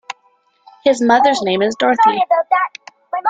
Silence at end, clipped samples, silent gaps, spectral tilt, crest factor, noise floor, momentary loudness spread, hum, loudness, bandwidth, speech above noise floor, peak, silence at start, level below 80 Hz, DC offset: 0 s; under 0.1%; none; -4 dB/octave; 14 dB; -58 dBFS; 13 LU; none; -15 LUFS; 9.4 kHz; 44 dB; -2 dBFS; 0.1 s; -62 dBFS; under 0.1%